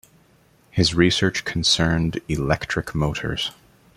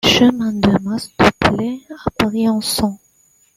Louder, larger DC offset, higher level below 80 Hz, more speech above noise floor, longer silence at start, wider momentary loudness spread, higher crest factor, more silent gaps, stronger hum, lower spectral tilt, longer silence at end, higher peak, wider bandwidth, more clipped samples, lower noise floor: second, -21 LUFS vs -17 LUFS; neither; about the same, -40 dBFS vs -40 dBFS; second, 36 dB vs 41 dB; first, 0.75 s vs 0.05 s; second, 8 LU vs 11 LU; about the same, 20 dB vs 16 dB; neither; neither; about the same, -4.5 dB/octave vs -4.5 dB/octave; second, 0.45 s vs 0.6 s; about the same, -2 dBFS vs 0 dBFS; about the same, 15.5 kHz vs 16 kHz; neither; about the same, -57 dBFS vs -56 dBFS